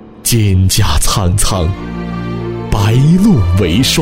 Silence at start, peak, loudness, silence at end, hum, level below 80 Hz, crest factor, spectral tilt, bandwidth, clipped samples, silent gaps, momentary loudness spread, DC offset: 0 s; 0 dBFS; -12 LUFS; 0 s; none; -20 dBFS; 10 dB; -5 dB/octave; 16.5 kHz; under 0.1%; none; 11 LU; under 0.1%